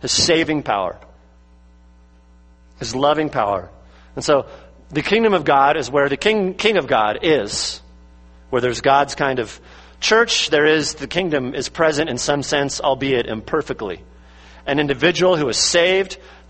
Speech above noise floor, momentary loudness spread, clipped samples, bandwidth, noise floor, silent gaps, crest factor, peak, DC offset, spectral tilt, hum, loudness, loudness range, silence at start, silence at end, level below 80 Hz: 30 dB; 12 LU; under 0.1%; 8.8 kHz; -49 dBFS; none; 20 dB; 0 dBFS; under 0.1%; -3.5 dB/octave; none; -18 LUFS; 5 LU; 0 s; 0.15 s; -46 dBFS